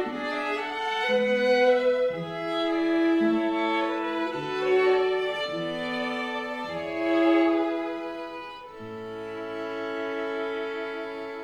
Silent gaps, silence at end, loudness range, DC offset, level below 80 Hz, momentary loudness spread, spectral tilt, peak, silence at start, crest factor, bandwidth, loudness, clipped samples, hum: none; 0 s; 8 LU; under 0.1%; -66 dBFS; 13 LU; -5.5 dB/octave; -10 dBFS; 0 s; 16 dB; 19 kHz; -26 LUFS; under 0.1%; none